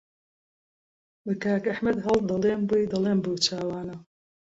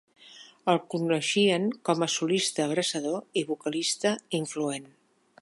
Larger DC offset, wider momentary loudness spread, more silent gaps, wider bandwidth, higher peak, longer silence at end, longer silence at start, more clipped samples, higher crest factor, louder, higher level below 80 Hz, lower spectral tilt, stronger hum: neither; first, 12 LU vs 8 LU; neither; second, 8 kHz vs 11.5 kHz; about the same, -10 dBFS vs -8 dBFS; about the same, 0.5 s vs 0.55 s; first, 1.25 s vs 0.25 s; neither; about the same, 18 dB vs 20 dB; about the same, -26 LUFS vs -27 LUFS; first, -58 dBFS vs -80 dBFS; first, -5 dB/octave vs -3.5 dB/octave; neither